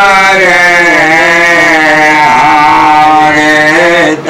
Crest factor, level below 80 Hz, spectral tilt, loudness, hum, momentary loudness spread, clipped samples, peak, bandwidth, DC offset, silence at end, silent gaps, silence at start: 4 dB; -38 dBFS; -3.5 dB/octave; -4 LUFS; none; 1 LU; 0.9%; 0 dBFS; 16.5 kHz; 0.7%; 0 s; none; 0 s